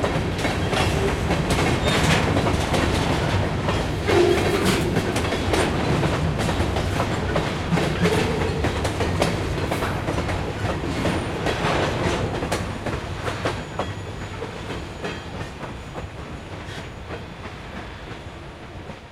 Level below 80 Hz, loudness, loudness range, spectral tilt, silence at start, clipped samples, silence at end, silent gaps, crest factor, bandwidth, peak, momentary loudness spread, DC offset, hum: -34 dBFS; -23 LUFS; 12 LU; -5.5 dB/octave; 0 s; under 0.1%; 0 s; none; 18 dB; 16 kHz; -6 dBFS; 15 LU; under 0.1%; none